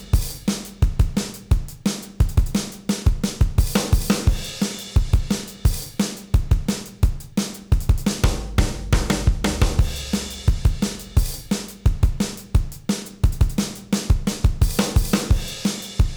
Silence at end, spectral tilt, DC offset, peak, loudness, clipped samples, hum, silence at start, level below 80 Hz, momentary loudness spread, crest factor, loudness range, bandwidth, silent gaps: 0 s; -5 dB/octave; under 0.1%; -8 dBFS; -23 LUFS; under 0.1%; none; 0 s; -22 dBFS; 6 LU; 12 dB; 1 LU; over 20 kHz; none